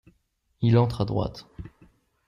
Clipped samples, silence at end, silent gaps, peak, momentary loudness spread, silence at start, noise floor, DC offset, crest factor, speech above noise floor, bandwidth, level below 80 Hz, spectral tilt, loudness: under 0.1%; 0.6 s; none; -8 dBFS; 23 LU; 0.6 s; -69 dBFS; under 0.1%; 18 dB; 45 dB; 9.8 kHz; -48 dBFS; -9 dB/octave; -25 LUFS